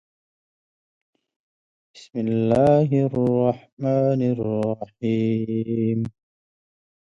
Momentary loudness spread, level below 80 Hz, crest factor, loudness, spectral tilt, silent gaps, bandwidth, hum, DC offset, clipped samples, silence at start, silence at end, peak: 10 LU; -56 dBFS; 18 dB; -22 LUFS; -9.5 dB/octave; 3.72-3.77 s; 8.4 kHz; none; under 0.1%; under 0.1%; 1.95 s; 1 s; -6 dBFS